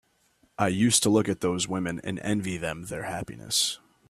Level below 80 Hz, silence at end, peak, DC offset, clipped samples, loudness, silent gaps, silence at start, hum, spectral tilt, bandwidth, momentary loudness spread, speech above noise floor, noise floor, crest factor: -58 dBFS; 0.35 s; -6 dBFS; under 0.1%; under 0.1%; -26 LUFS; none; 0.6 s; none; -3.5 dB/octave; 15.5 kHz; 13 LU; 40 dB; -66 dBFS; 20 dB